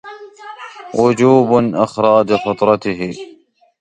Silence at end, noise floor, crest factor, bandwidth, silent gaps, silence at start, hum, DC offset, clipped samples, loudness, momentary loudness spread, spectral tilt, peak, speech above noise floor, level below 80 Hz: 0.55 s; -34 dBFS; 16 dB; 9.6 kHz; none; 0.05 s; none; under 0.1%; under 0.1%; -14 LUFS; 21 LU; -7 dB/octave; 0 dBFS; 21 dB; -52 dBFS